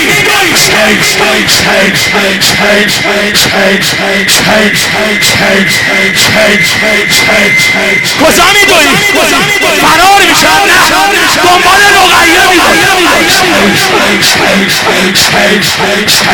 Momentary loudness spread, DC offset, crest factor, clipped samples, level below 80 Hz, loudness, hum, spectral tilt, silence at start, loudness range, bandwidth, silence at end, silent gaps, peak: 4 LU; 0.6%; 6 dB; 0.9%; -34 dBFS; -4 LUFS; none; -2 dB/octave; 0 s; 2 LU; over 20 kHz; 0 s; none; 0 dBFS